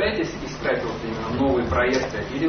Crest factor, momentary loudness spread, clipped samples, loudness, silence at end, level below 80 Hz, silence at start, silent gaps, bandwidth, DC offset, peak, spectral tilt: 14 dB; 7 LU; under 0.1%; -24 LUFS; 0 s; -38 dBFS; 0 s; none; 6.6 kHz; under 0.1%; -10 dBFS; -5.5 dB/octave